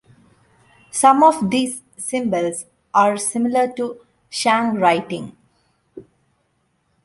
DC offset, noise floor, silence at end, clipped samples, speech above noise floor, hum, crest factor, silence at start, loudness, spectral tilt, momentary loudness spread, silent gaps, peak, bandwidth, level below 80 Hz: under 0.1%; -66 dBFS; 1.05 s; under 0.1%; 49 dB; none; 18 dB; 0.95 s; -18 LUFS; -4 dB/octave; 15 LU; none; -2 dBFS; 11.5 kHz; -64 dBFS